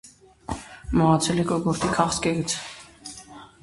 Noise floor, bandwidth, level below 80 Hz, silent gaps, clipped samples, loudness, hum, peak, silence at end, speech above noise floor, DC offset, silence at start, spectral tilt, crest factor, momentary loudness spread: -45 dBFS; 11.5 kHz; -44 dBFS; none; under 0.1%; -23 LUFS; none; -4 dBFS; 0.15 s; 22 dB; under 0.1%; 0.05 s; -5 dB/octave; 22 dB; 20 LU